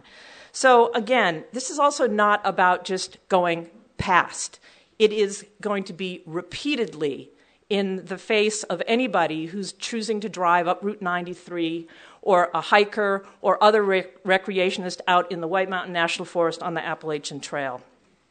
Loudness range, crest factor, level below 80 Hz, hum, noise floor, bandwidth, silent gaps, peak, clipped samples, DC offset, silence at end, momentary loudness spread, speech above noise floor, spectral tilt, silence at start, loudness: 6 LU; 24 dB; -60 dBFS; none; -47 dBFS; 9.4 kHz; none; 0 dBFS; under 0.1%; under 0.1%; 0.5 s; 12 LU; 24 dB; -3.5 dB/octave; 0.2 s; -23 LUFS